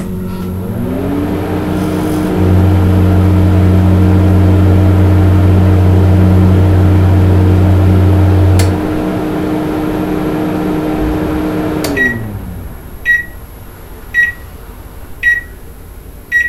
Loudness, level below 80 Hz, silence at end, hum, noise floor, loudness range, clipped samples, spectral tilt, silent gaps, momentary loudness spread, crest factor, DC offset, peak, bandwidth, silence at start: -11 LUFS; -28 dBFS; 0 s; none; -30 dBFS; 7 LU; 0.2%; -8 dB/octave; none; 11 LU; 10 dB; under 0.1%; 0 dBFS; 13 kHz; 0 s